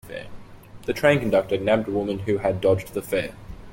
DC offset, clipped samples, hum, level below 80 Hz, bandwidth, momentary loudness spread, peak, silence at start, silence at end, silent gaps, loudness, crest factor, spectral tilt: under 0.1%; under 0.1%; none; -48 dBFS; 16.5 kHz; 17 LU; -4 dBFS; 0.05 s; 0 s; none; -23 LUFS; 20 dB; -6.5 dB/octave